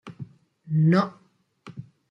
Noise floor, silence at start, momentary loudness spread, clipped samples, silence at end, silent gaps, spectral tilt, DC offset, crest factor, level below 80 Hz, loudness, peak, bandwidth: -52 dBFS; 0.05 s; 24 LU; under 0.1%; 0.3 s; none; -9 dB/octave; under 0.1%; 18 dB; -68 dBFS; -23 LUFS; -8 dBFS; 6.4 kHz